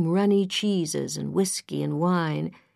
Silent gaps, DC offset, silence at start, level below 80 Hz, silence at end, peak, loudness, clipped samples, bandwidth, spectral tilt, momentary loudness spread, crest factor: none; under 0.1%; 0 s; -70 dBFS; 0.25 s; -12 dBFS; -25 LUFS; under 0.1%; 14 kHz; -5 dB/octave; 7 LU; 14 dB